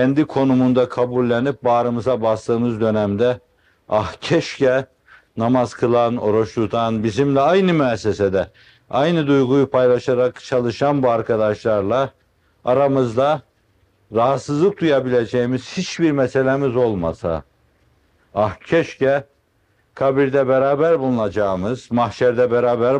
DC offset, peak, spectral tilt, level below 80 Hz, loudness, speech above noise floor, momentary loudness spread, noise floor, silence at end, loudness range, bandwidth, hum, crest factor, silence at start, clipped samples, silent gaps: under 0.1%; -4 dBFS; -7 dB/octave; -52 dBFS; -18 LUFS; 44 dB; 7 LU; -62 dBFS; 0 s; 3 LU; 9.8 kHz; none; 14 dB; 0 s; under 0.1%; none